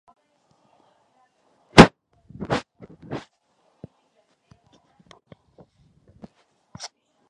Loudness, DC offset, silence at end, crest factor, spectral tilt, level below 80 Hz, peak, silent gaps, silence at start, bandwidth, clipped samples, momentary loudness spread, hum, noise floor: -16 LUFS; under 0.1%; 4.1 s; 26 dB; -5.5 dB/octave; -44 dBFS; 0 dBFS; none; 1.75 s; 11 kHz; under 0.1%; 27 LU; none; -67 dBFS